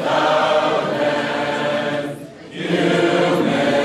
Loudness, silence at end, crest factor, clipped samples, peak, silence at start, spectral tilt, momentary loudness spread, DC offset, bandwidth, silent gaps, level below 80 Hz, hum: -18 LUFS; 0 s; 14 dB; under 0.1%; -4 dBFS; 0 s; -5 dB/octave; 11 LU; under 0.1%; 13.5 kHz; none; -62 dBFS; none